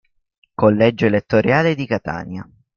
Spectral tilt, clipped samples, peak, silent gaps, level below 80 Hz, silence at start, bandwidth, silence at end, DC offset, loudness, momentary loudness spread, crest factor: -8 dB/octave; under 0.1%; -2 dBFS; none; -50 dBFS; 0.6 s; 7 kHz; 0.35 s; under 0.1%; -17 LUFS; 17 LU; 16 dB